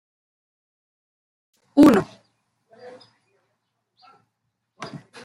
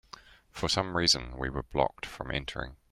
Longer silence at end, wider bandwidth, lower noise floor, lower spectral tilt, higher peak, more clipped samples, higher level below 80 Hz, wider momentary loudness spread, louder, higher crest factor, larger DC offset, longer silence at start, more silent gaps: about the same, 0.25 s vs 0.15 s; second, 14.5 kHz vs 16 kHz; first, -77 dBFS vs -53 dBFS; first, -6.5 dB/octave vs -3 dB/octave; first, -2 dBFS vs -10 dBFS; neither; second, -58 dBFS vs -46 dBFS; first, 24 LU vs 19 LU; first, -17 LUFS vs -30 LUFS; about the same, 22 dB vs 22 dB; neither; first, 1.75 s vs 0.15 s; neither